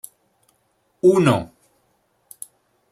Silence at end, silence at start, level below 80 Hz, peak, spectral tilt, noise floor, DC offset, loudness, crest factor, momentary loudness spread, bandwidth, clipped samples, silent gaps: 1.45 s; 1.05 s; -60 dBFS; -4 dBFS; -6.5 dB/octave; -66 dBFS; under 0.1%; -18 LUFS; 20 dB; 24 LU; 15 kHz; under 0.1%; none